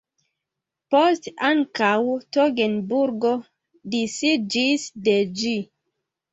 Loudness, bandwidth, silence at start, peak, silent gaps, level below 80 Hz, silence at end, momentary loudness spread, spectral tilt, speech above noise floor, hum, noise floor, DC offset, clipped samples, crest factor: -22 LUFS; 8.2 kHz; 0.9 s; -4 dBFS; none; -68 dBFS; 0.7 s; 7 LU; -4 dB/octave; 63 dB; none; -85 dBFS; under 0.1%; under 0.1%; 18 dB